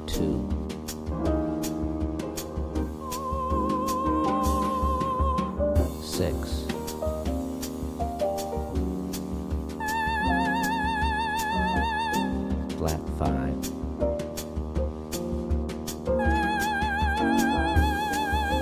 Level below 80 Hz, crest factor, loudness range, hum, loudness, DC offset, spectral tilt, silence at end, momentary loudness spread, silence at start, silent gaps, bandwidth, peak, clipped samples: -34 dBFS; 18 dB; 4 LU; none; -28 LUFS; under 0.1%; -5.5 dB/octave; 0 s; 8 LU; 0 s; none; 16 kHz; -8 dBFS; under 0.1%